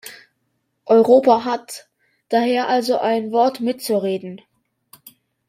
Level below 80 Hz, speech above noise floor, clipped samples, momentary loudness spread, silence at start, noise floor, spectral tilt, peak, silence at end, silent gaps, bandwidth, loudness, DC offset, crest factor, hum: -68 dBFS; 54 dB; under 0.1%; 23 LU; 0.05 s; -71 dBFS; -5 dB/octave; -2 dBFS; 1.1 s; none; 16 kHz; -18 LUFS; under 0.1%; 18 dB; none